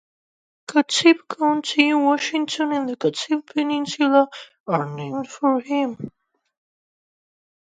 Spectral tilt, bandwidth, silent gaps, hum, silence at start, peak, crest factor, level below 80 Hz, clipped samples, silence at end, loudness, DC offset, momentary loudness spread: -4 dB/octave; 9.4 kHz; 4.60-4.64 s; none; 0.7 s; -2 dBFS; 20 dB; -72 dBFS; under 0.1%; 1.55 s; -21 LUFS; under 0.1%; 11 LU